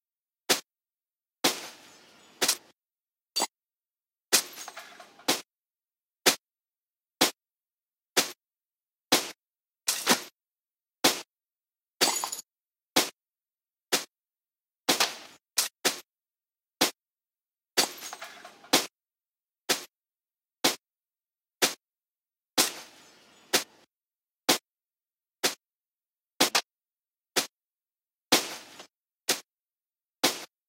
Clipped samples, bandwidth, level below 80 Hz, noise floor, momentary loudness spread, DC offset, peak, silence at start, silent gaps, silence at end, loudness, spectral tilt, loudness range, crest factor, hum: under 0.1%; 16 kHz; -84 dBFS; under -90 dBFS; 17 LU; under 0.1%; -6 dBFS; 0.5 s; none; 0.25 s; -28 LUFS; -0.5 dB/octave; 3 LU; 28 dB; none